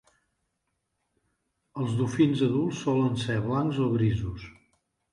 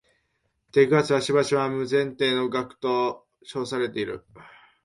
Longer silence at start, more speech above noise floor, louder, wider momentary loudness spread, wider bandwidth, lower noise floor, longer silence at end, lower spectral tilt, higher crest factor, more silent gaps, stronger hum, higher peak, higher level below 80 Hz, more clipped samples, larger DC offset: first, 1.75 s vs 0.75 s; first, 53 dB vs 49 dB; second, -27 LUFS vs -24 LUFS; second, 10 LU vs 13 LU; about the same, 11.5 kHz vs 11.5 kHz; first, -79 dBFS vs -73 dBFS; first, 0.6 s vs 0.35 s; first, -7.5 dB/octave vs -5 dB/octave; about the same, 18 dB vs 20 dB; neither; neither; second, -10 dBFS vs -6 dBFS; first, -52 dBFS vs -64 dBFS; neither; neither